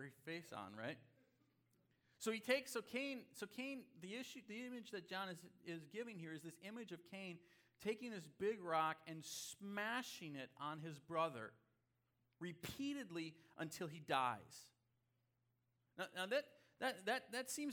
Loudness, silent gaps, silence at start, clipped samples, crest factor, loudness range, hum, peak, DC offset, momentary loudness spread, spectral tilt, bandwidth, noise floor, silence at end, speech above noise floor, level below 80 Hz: -47 LUFS; none; 0 s; under 0.1%; 24 dB; 6 LU; none; -24 dBFS; under 0.1%; 13 LU; -3.5 dB/octave; 19.5 kHz; -85 dBFS; 0 s; 38 dB; -86 dBFS